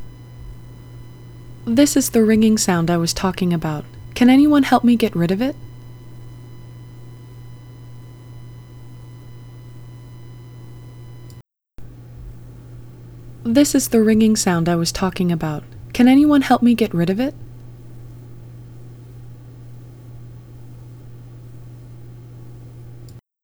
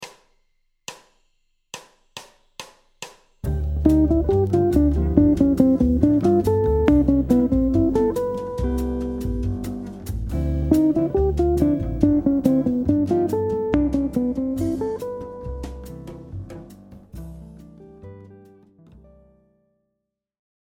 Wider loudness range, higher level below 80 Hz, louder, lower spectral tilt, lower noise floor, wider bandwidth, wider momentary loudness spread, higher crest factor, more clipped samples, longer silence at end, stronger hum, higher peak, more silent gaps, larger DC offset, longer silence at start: first, 23 LU vs 20 LU; second, -44 dBFS vs -32 dBFS; first, -16 LUFS vs -20 LUFS; second, -5 dB/octave vs -8.5 dB/octave; second, -43 dBFS vs -80 dBFS; first, over 20 kHz vs 16.5 kHz; first, 26 LU vs 22 LU; about the same, 20 dB vs 22 dB; neither; second, 0.25 s vs 2.25 s; neither; about the same, 0 dBFS vs 0 dBFS; neither; neither; about the same, 0 s vs 0 s